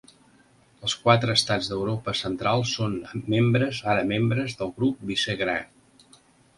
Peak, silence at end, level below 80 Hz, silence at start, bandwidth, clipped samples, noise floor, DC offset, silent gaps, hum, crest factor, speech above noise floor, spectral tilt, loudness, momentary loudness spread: -4 dBFS; 0.9 s; -56 dBFS; 0.8 s; 11.5 kHz; under 0.1%; -58 dBFS; under 0.1%; none; none; 22 dB; 34 dB; -5 dB/octave; -25 LUFS; 8 LU